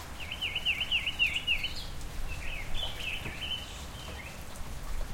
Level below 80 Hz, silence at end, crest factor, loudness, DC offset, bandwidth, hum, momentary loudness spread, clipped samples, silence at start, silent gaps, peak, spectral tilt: -42 dBFS; 0 s; 16 dB; -33 LUFS; under 0.1%; 16.5 kHz; none; 15 LU; under 0.1%; 0 s; none; -16 dBFS; -2 dB/octave